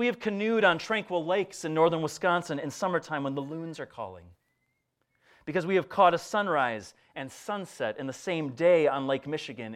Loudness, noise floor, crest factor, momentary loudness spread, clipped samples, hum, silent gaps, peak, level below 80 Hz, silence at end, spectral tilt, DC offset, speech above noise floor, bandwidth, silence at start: -28 LUFS; -77 dBFS; 20 dB; 16 LU; under 0.1%; none; none; -8 dBFS; -74 dBFS; 0 s; -5 dB/octave; under 0.1%; 49 dB; 14.5 kHz; 0 s